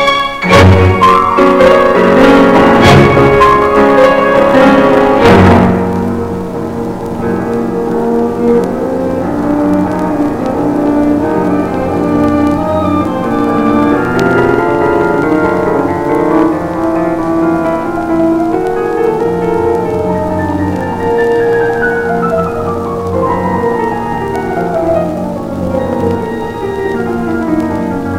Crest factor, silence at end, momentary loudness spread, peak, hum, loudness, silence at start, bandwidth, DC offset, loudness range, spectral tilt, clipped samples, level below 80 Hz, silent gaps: 10 dB; 0 s; 10 LU; 0 dBFS; none; -10 LUFS; 0 s; 16 kHz; under 0.1%; 8 LU; -7 dB/octave; under 0.1%; -32 dBFS; none